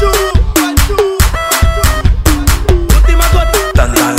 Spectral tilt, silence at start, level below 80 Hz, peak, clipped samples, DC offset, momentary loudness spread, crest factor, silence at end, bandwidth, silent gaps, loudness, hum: -4.5 dB/octave; 0 s; -10 dBFS; 0 dBFS; 0.2%; under 0.1%; 2 LU; 8 dB; 0 s; 16.5 kHz; none; -11 LUFS; none